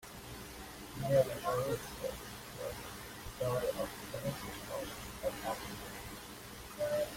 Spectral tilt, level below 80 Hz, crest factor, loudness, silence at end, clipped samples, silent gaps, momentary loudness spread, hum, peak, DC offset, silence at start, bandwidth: -4.5 dB/octave; -56 dBFS; 22 dB; -39 LUFS; 0 s; under 0.1%; none; 14 LU; 60 Hz at -55 dBFS; -18 dBFS; under 0.1%; 0 s; 16.5 kHz